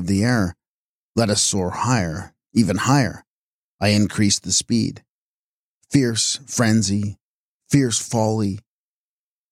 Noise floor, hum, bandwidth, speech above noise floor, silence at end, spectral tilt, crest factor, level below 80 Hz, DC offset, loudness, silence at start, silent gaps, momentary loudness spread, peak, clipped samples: under -90 dBFS; none; 15.5 kHz; over 71 dB; 0.9 s; -4.5 dB/octave; 18 dB; -52 dBFS; under 0.1%; -20 LUFS; 0 s; 0.68-1.15 s, 3.27-3.79 s, 5.10-5.81 s, 7.21-7.60 s; 9 LU; -4 dBFS; under 0.1%